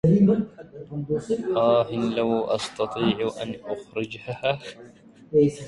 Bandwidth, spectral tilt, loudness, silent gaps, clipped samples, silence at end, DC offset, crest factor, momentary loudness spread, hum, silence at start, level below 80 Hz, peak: 11.5 kHz; -7 dB/octave; -25 LUFS; none; under 0.1%; 0 s; under 0.1%; 16 dB; 13 LU; none; 0.05 s; -56 dBFS; -8 dBFS